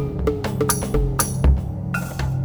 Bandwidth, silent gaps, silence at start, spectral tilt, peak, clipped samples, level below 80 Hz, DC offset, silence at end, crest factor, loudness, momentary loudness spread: over 20 kHz; none; 0 s; -5.5 dB/octave; -4 dBFS; under 0.1%; -24 dBFS; under 0.1%; 0 s; 16 dB; -22 LUFS; 7 LU